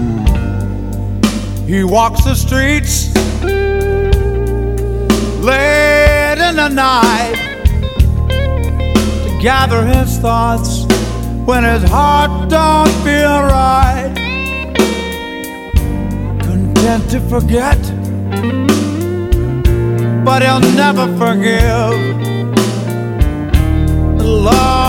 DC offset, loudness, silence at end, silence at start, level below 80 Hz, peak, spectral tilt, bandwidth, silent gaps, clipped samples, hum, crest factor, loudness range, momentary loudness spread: under 0.1%; -13 LUFS; 0 s; 0 s; -18 dBFS; 0 dBFS; -5.5 dB/octave; 17 kHz; none; 0.3%; none; 12 dB; 3 LU; 7 LU